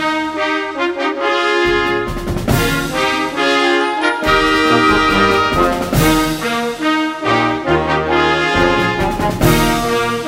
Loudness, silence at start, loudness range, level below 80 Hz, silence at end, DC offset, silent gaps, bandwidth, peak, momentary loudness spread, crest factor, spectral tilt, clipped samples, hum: -14 LUFS; 0 s; 2 LU; -30 dBFS; 0 s; under 0.1%; none; 16.5 kHz; 0 dBFS; 6 LU; 14 dB; -4.5 dB/octave; under 0.1%; none